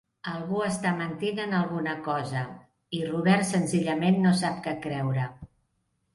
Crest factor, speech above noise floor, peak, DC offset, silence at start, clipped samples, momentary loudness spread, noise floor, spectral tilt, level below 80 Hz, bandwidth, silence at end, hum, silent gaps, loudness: 18 dB; 48 dB; -8 dBFS; under 0.1%; 0.25 s; under 0.1%; 11 LU; -74 dBFS; -6 dB/octave; -64 dBFS; 11.5 kHz; 0.7 s; none; none; -27 LUFS